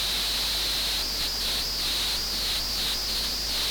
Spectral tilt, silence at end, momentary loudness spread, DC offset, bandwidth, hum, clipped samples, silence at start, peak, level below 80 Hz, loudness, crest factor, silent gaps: -0.5 dB/octave; 0 s; 1 LU; under 0.1%; over 20 kHz; none; under 0.1%; 0 s; -18 dBFS; -40 dBFS; -25 LUFS; 10 dB; none